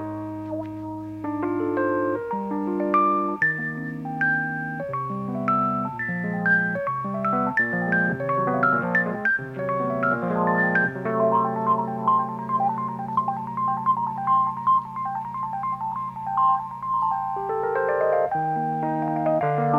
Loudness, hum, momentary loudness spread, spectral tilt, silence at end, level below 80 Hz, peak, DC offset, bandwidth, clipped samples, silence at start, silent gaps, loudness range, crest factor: -24 LUFS; none; 8 LU; -9 dB/octave; 0 s; -60 dBFS; -8 dBFS; under 0.1%; 7.8 kHz; under 0.1%; 0 s; none; 2 LU; 16 dB